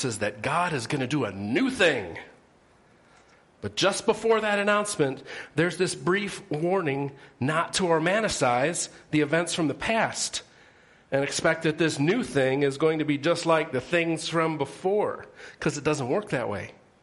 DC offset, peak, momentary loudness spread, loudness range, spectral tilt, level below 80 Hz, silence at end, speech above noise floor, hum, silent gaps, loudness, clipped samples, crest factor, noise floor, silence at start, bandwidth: under 0.1%; -8 dBFS; 8 LU; 3 LU; -4.5 dB/octave; -60 dBFS; 0.3 s; 33 dB; none; none; -26 LUFS; under 0.1%; 18 dB; -59 dBFS; 0 s; 11.5 kHz